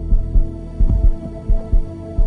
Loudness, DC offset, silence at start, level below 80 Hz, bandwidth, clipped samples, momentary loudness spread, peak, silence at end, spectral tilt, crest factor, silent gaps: -22 LUFS; under 0.1%; 0 s; -16 dBFS; 2.1 kHz; under 0.1%; 9 LU; -4 dBFS; 0 s; -10.5 dB/octave; 12 dB; none